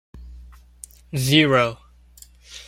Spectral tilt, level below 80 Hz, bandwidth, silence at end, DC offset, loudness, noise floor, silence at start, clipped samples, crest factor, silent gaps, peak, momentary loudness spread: -4.5 dB/octave; -46 dBFS; 16.5 kHz; 0.05 s; under 0.1%; -19 LUFS; -49 dBFS; 0.15 s; under 0.1%; 20 dB; none; -4 dBFS; 27 LU